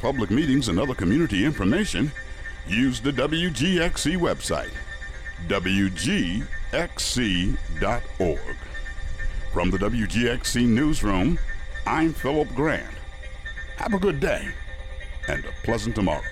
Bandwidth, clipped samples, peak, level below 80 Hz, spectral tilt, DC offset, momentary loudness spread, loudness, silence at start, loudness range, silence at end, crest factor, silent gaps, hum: 15.5 kHz; under 0.1%; -10 dBFS; -32 dBFS; -5 dB/octave; under 0.1%; 14 LU; -24 LUFS; 0 s; 4 LU; 0 s; 14 dB; none; none